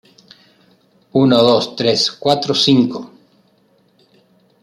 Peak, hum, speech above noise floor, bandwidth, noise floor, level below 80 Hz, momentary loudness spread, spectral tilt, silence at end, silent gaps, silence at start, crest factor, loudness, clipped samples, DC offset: -2 dBFS; none; 42 dB; 12.5 kHz; -56 dBFS; -60 dBFS; 9 LU; -5 dB/octave; 1.55 s; none; 1.15 s; 16 dB; -14 LUFS; under 0.1%; under 0.1%